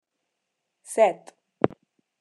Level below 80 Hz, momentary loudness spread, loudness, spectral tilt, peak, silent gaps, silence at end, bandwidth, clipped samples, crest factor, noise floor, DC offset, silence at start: -70 dBFS; 11 LU; -25 LUFS; -5.5 dB/octave; -4 dBFS; none; 0.55 s; 12.5 kHz; under 0.1%; 26 dB; -81 dBFS; under 0.1%; 0.9 s